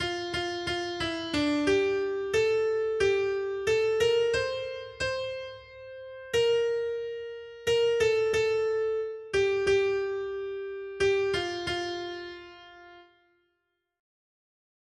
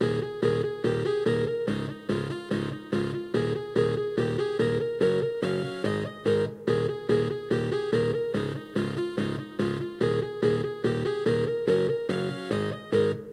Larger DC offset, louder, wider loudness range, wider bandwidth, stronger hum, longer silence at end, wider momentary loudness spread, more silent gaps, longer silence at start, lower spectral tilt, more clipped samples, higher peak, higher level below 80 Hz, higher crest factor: neither; about the same, -28 LUFS vs -28 LUFS; first, 6 LU vs 2 LU; about the same, 12.5 kHz vs 12 kHz; neither; first, 1.95 s vs 0 s; first, 14 LU vs 5 LU; neither; about the same, 0 s vs 0 s; second, -4 dB/octave vs -7 dB/octave; neither; second, -14 dBFS vs -10 dBFS; about the same, -58 dBFS vs -56 dBFS; about the same, 14 dB vs 16 dB